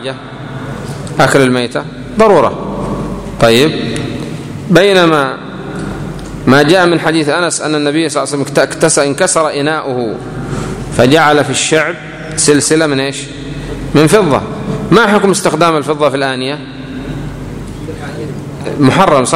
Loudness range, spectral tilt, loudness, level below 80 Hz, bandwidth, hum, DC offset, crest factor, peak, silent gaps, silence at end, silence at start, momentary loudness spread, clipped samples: 2 LU; -4.5 dB/octave; -11 LUFS; -34 dBFS; 16.5 kHz; none; under 0.1%; 12 dB; 0 dBFS; none; 0 s; 0 s; 15 LU; 0.4%